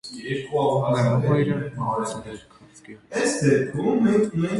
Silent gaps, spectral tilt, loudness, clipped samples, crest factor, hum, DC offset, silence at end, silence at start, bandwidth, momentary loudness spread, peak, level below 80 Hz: none; -6.5 dB/octave; -23 LUFS; under 0.1%; 16 dB; none; under 0.1%; 0 s; 0.05 s; 11.5 kHz; 11 LU; -8 dBFS; -56 dBFS